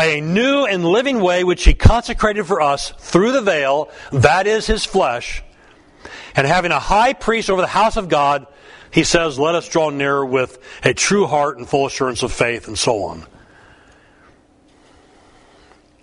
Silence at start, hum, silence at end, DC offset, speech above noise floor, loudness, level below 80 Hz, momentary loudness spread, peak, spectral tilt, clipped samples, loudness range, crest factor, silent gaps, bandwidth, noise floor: 0 s; none; 2.8 s; under 0.1%; 36 dB; -17 LUFS; -28 dBFS; 7 LU; 0 dBFS; -4.5 dB/octave; under 0.1%; 6 LU; 18 dB; none; 11 kHz; -52 dBFS